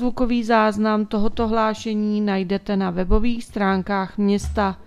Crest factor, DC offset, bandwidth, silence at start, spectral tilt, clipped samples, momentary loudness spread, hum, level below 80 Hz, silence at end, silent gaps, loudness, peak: 18 dB; under 0.1%; 11 kHz; 0 s; -6.5 dB/octave; under 0.1%; 5 LU; none; -34 dBFS; 0 s; none; -21 LUFS; -2 dBFS